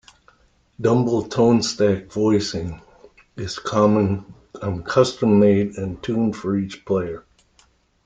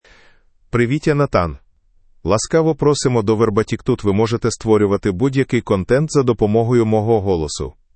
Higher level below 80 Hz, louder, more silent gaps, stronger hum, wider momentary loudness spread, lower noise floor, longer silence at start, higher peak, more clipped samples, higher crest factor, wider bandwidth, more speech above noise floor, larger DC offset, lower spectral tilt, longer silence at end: second, -52 dBFS vs -40 dBFS; second, -20 LUFS vs -17 LUFS; neither; neither; first, 13 LU vs 5 LU; first, -59 dBFS vs -53 dBFS; about the same, 0.8 s vs 0.75 s; about the same, -2 dBFS vs 0 dBFS; neither; about the same, 18 dB vs 16 dB; about the same, 9.2 kHz vs 8.8 kHz; about the same, 39 dB vs 37 dB; neither; about the same, -6.5 dB/octave vs -6.5 dB/octave; first, 0.85 s vs 0.25 s